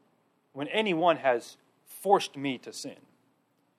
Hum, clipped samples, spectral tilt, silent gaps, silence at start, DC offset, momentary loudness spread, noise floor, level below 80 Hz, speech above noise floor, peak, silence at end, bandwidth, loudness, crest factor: none; under 0.1%; -4 dB/octave; none; 0.55 s; under 0.1%; 20 LU; -71 dBFS; -88 dBFS; 43 dB; -8 dBFS; 0.85 s; 15.5 kHz; -28 LUFS; 22 dB